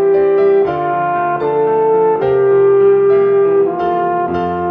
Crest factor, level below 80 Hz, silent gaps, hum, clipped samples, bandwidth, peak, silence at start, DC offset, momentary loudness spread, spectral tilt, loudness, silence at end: 10 dB; -48 dBFS; none; none; under 0.1%; 4.3 kHz; -2 dBFS; 0 s; under 0.1%; 6 LU; -9.5 dB/octave; -13 LUFS; 0 s